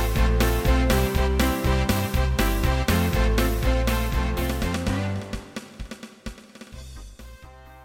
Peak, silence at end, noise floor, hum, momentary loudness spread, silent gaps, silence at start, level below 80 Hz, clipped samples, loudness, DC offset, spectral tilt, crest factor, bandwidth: -8 dBFS; 0 s; -45 dBFS; none; 20 LU; none; 0 s; -26 dBFS; under 0.1%; -23 LUFS; under 0.1%; -5.5 dB/octave; 16 dB; 17 kHz